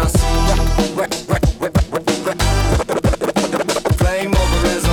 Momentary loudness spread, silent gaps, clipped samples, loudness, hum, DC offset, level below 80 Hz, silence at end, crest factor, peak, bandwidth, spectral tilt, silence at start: 3 LU; none; under 0.1%; -17 LUFS; none; under 0.1%; -20 dBFS; 0 s; 12 dB; -4 dBFS; 18 kHz; -5 dB/octave; 0 s